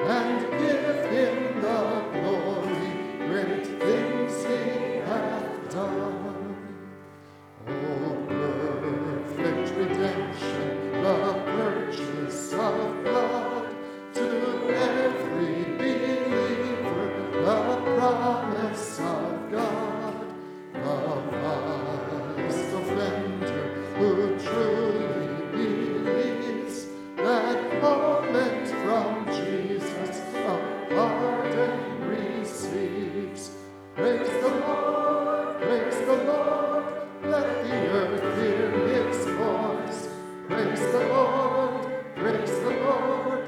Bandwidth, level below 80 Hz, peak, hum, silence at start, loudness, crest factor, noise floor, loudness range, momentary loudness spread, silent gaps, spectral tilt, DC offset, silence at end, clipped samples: 14.5 kHz; -70 dBFS; -10 dBFS; none; 0 s; -27 LUFS; 16 dB; -48 dBFS; 4 LU; 8 LU; none; -6 dB/octave; under 0.1%; 0 s; under 0.1%